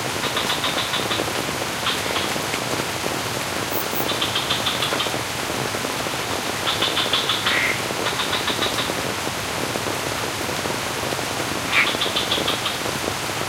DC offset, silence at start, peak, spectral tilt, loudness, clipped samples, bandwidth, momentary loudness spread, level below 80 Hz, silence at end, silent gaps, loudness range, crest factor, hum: under 0.1%; 0 s; -2 dBFS; -2.5 dB/octave; -22 LUFS; under 0.1%; 16 kHz; 5 LU; -48 dBFS; 0 s; none; 2 LU; 20 dB; none